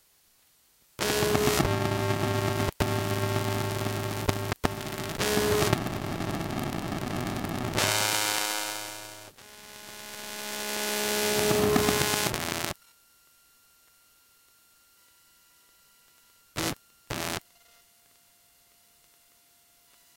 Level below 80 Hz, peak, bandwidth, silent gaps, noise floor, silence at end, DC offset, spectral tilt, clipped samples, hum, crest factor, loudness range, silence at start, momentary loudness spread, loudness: -48 dBFS; -2 dBFS; 17 kHz; none; -64 dBFS; 2.8 s; under 0.1%; -3.5 dB/octave; under 0.1%; none; 28 dB; 11 LU; 1 s; 15 LU; -28 LUFS